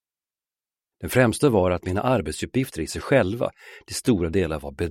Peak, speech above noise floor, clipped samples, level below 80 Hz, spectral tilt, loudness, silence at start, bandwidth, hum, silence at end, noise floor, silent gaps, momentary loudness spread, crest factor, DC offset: -4 dBFS; over 67 dB; under 0.1%; -44 dBFS; -6 dB/octave; -23 LUFS; 1 s; 16 kHz; none; 0 s; under -90 dBFS; none; 10 LU; 20 dB; under 0.1%